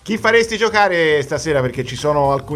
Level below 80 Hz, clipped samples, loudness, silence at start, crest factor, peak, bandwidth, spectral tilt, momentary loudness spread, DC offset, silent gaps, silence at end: -44 dBFS; under 0.1%; -16 LUFS; 0.05 s; 16 dB; 0 dBFS; 13.5 kHz; -4.5 dB/octave; 5 LU; under 0.1%; none; 0 s